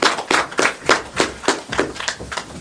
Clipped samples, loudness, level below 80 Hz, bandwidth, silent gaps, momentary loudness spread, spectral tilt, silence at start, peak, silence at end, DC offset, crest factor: under 0.1%; -19 LUFS; -46 dBFS; 11 kHz; none; 9 LU; -2 dB/octave; 0 s; 0 dBFS; 0 s; under 0.1%; 20 dB